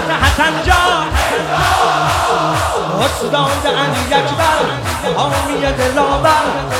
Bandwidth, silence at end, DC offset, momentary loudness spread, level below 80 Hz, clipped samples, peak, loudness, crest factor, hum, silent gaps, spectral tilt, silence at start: 17.5 kHz; 0 s; under 0.1%; 4 LU; -28 dBFS; under 0.1%; 0 dBFS; -14 LUFS; 14 dB; none; none; -4 dB/octave; 0 s